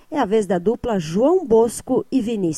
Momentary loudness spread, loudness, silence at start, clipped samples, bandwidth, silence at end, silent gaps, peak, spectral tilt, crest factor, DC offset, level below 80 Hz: 6 LU; -19 LUFS; 0.1 s; under 0.1%; 13.5 kHz; 0 s; none; -6 dBFS; -6 dB/octave; 14 dB; under 0.1%; -48 dBFS